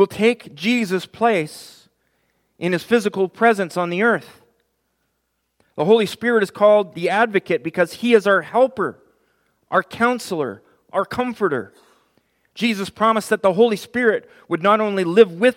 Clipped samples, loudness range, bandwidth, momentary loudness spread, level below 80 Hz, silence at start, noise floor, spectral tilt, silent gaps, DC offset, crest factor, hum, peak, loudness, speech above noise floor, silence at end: under 0.1%; 6 LU; 16 kHz; 11 LU; -66 dBFS; 0 s; -72 dBFS; -5.5 dB/octave; none; under 0.1%; 20 dB; none; 0 dBFS; -19 LUFS; 54 dB; 0.05 s